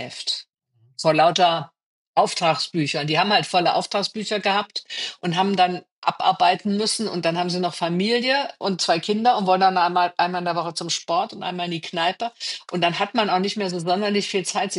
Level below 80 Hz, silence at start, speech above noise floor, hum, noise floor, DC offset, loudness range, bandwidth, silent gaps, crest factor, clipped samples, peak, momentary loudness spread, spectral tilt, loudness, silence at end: -76 dBFS; 0 s; 40 dB; none; -61 dBFS; under 0.1%; 3 LU; 11.5 kHz; 1.83-2.13 s, 5.92-6.02 s; 18 dB; under 0.1%; -4 dBFS; 9 LU; -4 dB/octave; -22 LUFS; 0 s